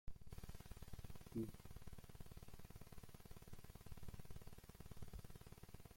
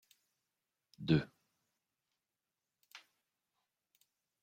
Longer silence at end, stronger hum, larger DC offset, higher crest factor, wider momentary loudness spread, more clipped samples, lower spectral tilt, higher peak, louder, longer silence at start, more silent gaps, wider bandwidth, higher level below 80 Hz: second, 0 s vs 1.45 s; neither; neither; second, 18 dB vs 26 dB; second, 9 LU vs 24 LU; neither; second, -6 dB/octave vs -7.5 dB/octave; second, -36 dBFS vs -18 dBFS; second, -58 LUFS vs -35 LUFS; second, 0.05 s vs 1 s; neither; first, 16.5 kHz vs 14.5 kHz; first, -60 dBFS vs -70 dBFS